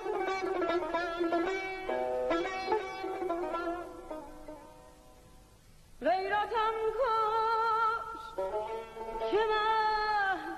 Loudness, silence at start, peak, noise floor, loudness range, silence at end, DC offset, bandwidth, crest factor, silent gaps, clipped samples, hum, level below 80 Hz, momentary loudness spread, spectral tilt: -32 LUFS; 0 s; -20 dBFS; -57 dBFS; 7 LU; 0 s; under 0.1%; 13 kHz; 14 dB; none; under 0.1%; none; -56 dBFS; 12 LU; -4 dB/octave